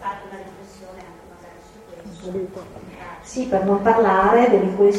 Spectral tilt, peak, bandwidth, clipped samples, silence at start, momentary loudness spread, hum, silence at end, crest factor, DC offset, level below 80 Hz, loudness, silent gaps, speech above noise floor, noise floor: -6.5 dB/octave; -4 dBFS; 11.5 kHz; under 0.1%; 0 s; 25 LU; none; 0 s; 18 dB; under 0.1%; -50 dBFS; -18 LUFS; none; 25 dB; -43 dBFS